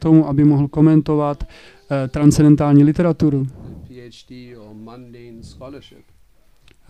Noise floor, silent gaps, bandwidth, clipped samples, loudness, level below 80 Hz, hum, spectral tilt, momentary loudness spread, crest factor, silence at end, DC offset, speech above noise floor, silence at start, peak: -54 dBFS; none; 12.5 kHz; under 0.1%; -15 LUFS; -40 dBFS; none; -8.5 dB/octave; 25 LU; 16 dB; 1.1 s; 0.2%; 38 dB; 0 s; 0 dBFS